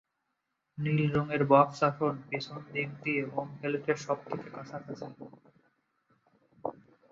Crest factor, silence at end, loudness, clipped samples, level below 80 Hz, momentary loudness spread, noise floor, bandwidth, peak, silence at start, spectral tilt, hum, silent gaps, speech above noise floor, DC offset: 24 dB; 0.4 s; -31 LUFS; under 0.1%; -68 dBFS; 19 LU; -82 dBFS; 7.6 kHz; -8 dBFS; 0.75 s; -7 dB/octave; none; none; 51 dB; under 0.1%